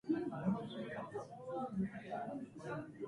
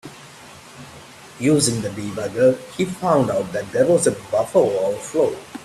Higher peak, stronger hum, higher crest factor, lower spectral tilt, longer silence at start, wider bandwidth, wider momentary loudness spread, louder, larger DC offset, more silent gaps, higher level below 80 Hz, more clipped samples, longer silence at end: second, -24 dBFS vs -4 dBFS; neither; about the same, 18 dB vs 18 dB; first, -8 dB/octave vs -5 dB/octave; about the same, 0.05 s vs 0.05 s; second, 11 kHz vs 13.5 kHz; second, 8 LU vs 23 LU; second, -43 LUFS vs -20 LUFS; neither; neither; second, -72 dBFS vs -56 dBFS; neither; about the same, 0 s vs 0 s